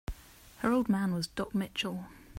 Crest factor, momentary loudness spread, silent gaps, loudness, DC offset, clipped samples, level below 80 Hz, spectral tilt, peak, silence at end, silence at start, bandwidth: 18 dB; 15 LU; none; -32 LUFS; under 0.1%; under 0.1%; -52 dBFS; -5.5 dB/octave; -14 dBFS; 0 s; 0.1 s; 16 kHz